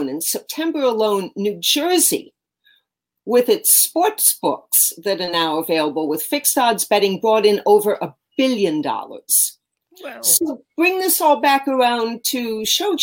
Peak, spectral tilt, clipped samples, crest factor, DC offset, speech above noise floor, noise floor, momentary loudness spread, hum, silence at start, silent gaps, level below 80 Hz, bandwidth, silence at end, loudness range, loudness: 0 dBFS; -2 dB/octave; under 0.1%; 18 dB; under 0.1%; 51 dB; -69 dBFS; 8 LU; none; 0 s; none; -70 dBFS; 17 kHz; 0 s; 2 LU; -17 LUFS